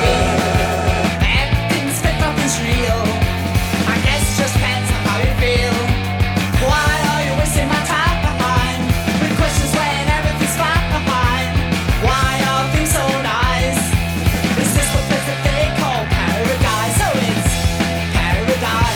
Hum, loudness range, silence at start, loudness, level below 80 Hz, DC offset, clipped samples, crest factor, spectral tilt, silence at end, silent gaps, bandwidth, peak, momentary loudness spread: none; 1 LU; 0 s; -16 LUFS; -24 dBFS; under 0.1%; under 0.1%; 14 dB; -4.5 dB/octave; 0 s; none; 19 kHz; -2 dBFS; 2 LU